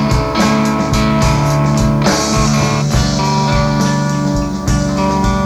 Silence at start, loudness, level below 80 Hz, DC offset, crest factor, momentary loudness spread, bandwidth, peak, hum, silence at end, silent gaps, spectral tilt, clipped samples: 0 s; -14 LUFS; -24 dBFS; under 0.1%; 12 dB; 3 LU; 14.5 kHz; 0 dBFS; none; 0 s; none; -5.5 dB/octave; under 0.1%